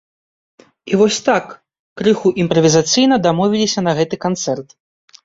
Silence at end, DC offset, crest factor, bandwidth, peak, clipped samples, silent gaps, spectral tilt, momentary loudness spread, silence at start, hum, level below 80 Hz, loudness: 0.6 s; under 0.1%; 16 dB; 7.8 kHz; -2 dBFS; under 0.1%; 1.79-1.96 s; -4.5 dB/octave; 8 LU; 0.85 s; none; -54 dBFS; -15 LUFS